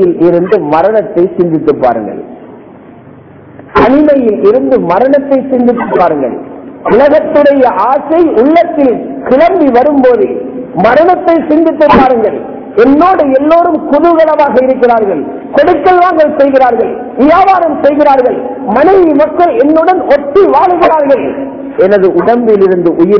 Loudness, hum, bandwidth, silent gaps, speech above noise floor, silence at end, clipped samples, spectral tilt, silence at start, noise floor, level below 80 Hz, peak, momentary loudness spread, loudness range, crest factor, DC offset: -7 LUFS; none; 5.4 kHz; none; 26 dB; 0 s; 6%; -8.5 dB/octave; 0 s; -33 dBFS; -40 dBFS; 0 dBFS; 8 LU; 3 LU; 6 dB; under 0.1%